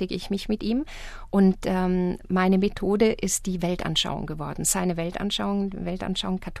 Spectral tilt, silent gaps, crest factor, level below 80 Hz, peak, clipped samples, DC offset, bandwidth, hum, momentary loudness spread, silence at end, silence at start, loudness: -4.5 dB/octave; none; 18 dB; -40 dBFS; -8 dBFS; under 0.1%; under 0.1%; 14 kHz; none; 8 LU; 0 s; 0 s; -25 LUFS